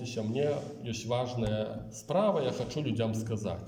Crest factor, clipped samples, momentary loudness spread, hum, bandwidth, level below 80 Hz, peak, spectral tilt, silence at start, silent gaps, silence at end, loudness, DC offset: 18 dB; under 0.1%; 9 LU; none; 16 kHz; -56 dBFS; -14 dBFS; -6 dB/octave; 0 s; none; 0 s; -32 LUFS; under 0.1%